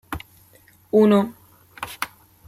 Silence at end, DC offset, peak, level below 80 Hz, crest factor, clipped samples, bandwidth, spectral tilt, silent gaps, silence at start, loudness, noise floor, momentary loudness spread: 0.4 s; under 0.1%; -6 dBFS; -52 dBFS; 18 dB; under 0.1%; 16 kHz; -6.5 dB/octave; none; 0.1 s; -20 LUFS; -54 dBFS; 19 LU